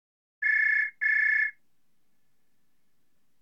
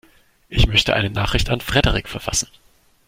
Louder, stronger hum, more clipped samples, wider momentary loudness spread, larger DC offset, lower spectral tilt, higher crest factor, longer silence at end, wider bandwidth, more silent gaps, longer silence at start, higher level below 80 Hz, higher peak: second, -24 LUFS vs -19 LUFS; neither; neither; about the same, 6 LU vs 8 LU; neither; second, 1 dB/octave vs -3.5 dB/octave; second, 14 dB vs 20 dB; first, 1.9 s vs 0.65 s; second, 7 kHz vs 16.5 kHz; neither; about the same, 0.4 s vs 0.5 s; second, -88 dBFS vs -28 dBFS; second, -16 dBFS vs -2 dBFS